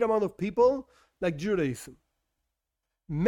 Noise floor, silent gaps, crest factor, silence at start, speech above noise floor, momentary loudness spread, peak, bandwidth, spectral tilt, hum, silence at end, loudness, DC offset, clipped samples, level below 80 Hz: -85 dBFS; none; 16 dB; 0 s; 58 dB; 13 LU; -12 dBFS; 16.5 kHz; -7 dB/octave; none; 0 s; -28 LUFS; under 0.1%; under 0.1%; -58 dBFS